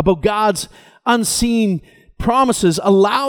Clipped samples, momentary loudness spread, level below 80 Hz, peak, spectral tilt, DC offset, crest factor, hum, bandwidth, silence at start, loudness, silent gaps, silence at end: under 0.1%; 10 LU; -38 dBFS; -2 dBFS; -4.5 dB/octave; under 0.1%; 14 dB; none; 19.5 kHz; 0 s; -16 LUFS; none; 0 s